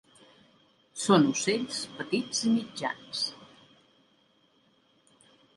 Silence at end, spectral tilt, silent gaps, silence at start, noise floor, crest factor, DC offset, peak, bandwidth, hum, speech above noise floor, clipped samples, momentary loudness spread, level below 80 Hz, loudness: 2.1 s; -4 dB/octave; none; 0.95 s; -67 dBFS; 24 dB; under 0.1%; -8 dBFS; 11.5 kHz; none; 39 dB; under 0.1%; 12 LU; -74 dBFS; -28 LUFS